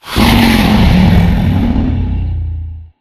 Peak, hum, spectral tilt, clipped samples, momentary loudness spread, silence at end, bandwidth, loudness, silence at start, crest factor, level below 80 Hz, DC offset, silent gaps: 0 dBFS; none; -6.5 dB/octave; 0.2%; 12 LU; 0.15 s; 14.5 kHz; -11 LUFS; 0.05 s; 10 dB; -16 dBFS; under 0.1%; none